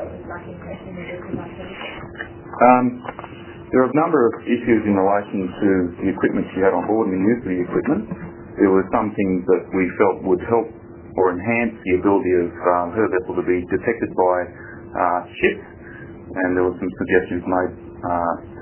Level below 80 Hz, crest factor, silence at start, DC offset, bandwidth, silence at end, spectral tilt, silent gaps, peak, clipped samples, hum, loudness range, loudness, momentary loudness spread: -46 dBFS; 20 dB; 0 s; under 0.1%; 3.2 kHz; 0 s; -11 dB/octave; none; 0 dBFS; under 0.1%; none; 3 LU; -20 LUFS; 16 LU